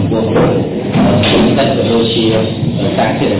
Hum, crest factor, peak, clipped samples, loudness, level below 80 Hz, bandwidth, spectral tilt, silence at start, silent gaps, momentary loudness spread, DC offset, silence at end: none; 12 dB; 0 dBFS; under 0.1%; -12 LUFS; -34 dBFS; 4 kHz; -11 dB/octave; 0 s; none; 5 LU; under 0.1%; 0 s